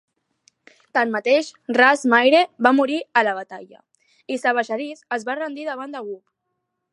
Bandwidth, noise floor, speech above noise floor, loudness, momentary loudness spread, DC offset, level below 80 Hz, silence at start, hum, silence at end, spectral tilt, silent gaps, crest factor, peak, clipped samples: 11.5 kHz; -77 dBFS; 57 dB; -20 LUFS; 17 LU; under 0.1%; -76 dBFS; 0.95 s; none; 0.75 s; -3.5 dB/octave; none; 20 dB; 0 dBFS; under 0.1%